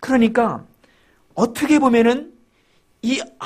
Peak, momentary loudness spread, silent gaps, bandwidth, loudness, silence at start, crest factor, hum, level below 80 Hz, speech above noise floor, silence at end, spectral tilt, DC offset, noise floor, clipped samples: -4 dBFS; 13 LU; none; 15 kHz; -18 LUFS; 0 s; 16 dB; none; -54 dBFS; 42 dB; 0 s; -5 dB/octave; under 0.1%; -59 dBFS; under 0.1%